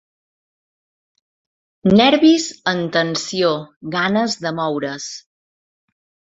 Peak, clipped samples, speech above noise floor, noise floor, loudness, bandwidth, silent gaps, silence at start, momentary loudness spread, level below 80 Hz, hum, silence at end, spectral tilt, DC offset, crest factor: -2 dBFS; under 0.1%; over 73 dB; under -90 dBFS; -17 LUFS; 8 kHz; 3.76-3.81 s; 1.85 s; 14 LU; -58 dBFS; none; 1.15 s; -4.5 dB/octave; under 0.1%; 18 dB